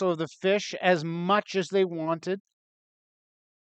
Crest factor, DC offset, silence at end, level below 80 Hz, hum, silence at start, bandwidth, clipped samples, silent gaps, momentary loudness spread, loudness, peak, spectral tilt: 18 dB; under 0.1%; 1.35 s; -82 dBFS; none; 0 s; 8.6 kHz; under 0.1%; none; 6 LU; -27 LUFS; -10 dBFS; -5.5 dB/octave